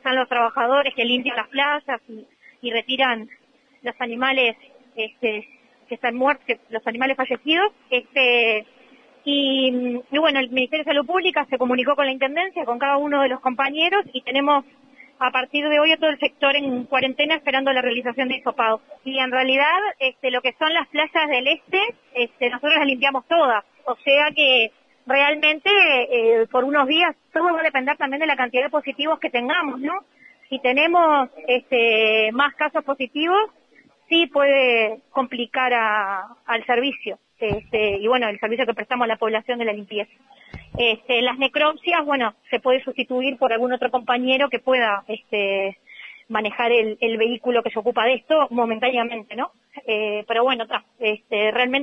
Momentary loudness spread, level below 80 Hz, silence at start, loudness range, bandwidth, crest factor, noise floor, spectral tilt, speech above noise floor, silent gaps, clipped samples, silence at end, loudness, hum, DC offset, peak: 10 LU; -60 dBFS; 0.05 s; 5 LU; 6.2 kHz; 18 dB; -56 dBFS; -5 dB/octave; 35 dB; none; under 0.1%; 0 s; -20 LUFS; none; under 0.1%; -4 dBFS